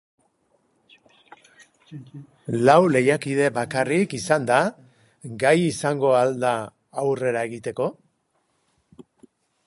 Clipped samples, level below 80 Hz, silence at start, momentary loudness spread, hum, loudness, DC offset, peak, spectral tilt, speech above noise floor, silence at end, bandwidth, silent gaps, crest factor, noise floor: under 0.1%; -66 dBFS; 1.9 s; 22 LU; none; -21 LUFS; under 0.1%; -2 dBFS; -5.5 dB/octave; 49 dB; 1.75 s; 11.5 kHz; none; 22 dB; -70 dBFS